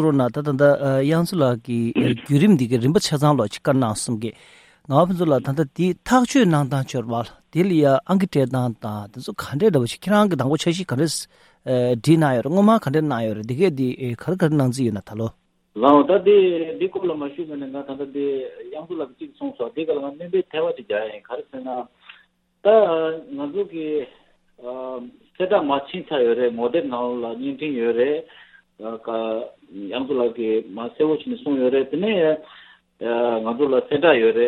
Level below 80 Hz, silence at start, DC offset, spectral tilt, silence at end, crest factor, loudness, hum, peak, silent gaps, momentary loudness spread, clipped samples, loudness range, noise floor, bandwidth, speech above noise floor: -58 dBFS; 0 s; under 0.1%; -6.5 dB/octave; 0 s; 20 dB; -21 LUFS; none; 0 dBFS; none; 15 LU; under 0.1%; 7 LU; -57 dBFS; 16 kHz; 37 dB